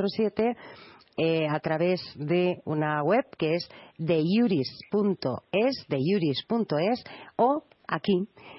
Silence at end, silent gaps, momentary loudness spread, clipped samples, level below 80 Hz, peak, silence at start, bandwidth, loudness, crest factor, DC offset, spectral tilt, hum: 0 s; none; 8 LU; under 0.1%; -68 dBFS; -10 dBFS; 0 s; 6 kHz; -27 LUFS; 18 dB; under 0.1%; -9.5 dB/octave; none